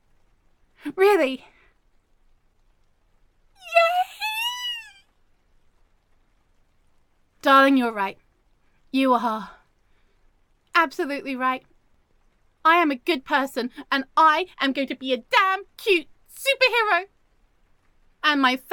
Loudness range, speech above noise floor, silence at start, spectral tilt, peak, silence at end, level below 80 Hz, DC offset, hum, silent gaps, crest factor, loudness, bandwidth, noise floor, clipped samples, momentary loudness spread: 6 LU; 41 dB; 0.85 s; -2.5 dB/octave; -4 dBFS; 0 s; -62 dBFS; under 0.1%; none; none; 22 dB; -22 LUFS; 17.5 kHz; -62 dBFS; under 0.1%; 11 LU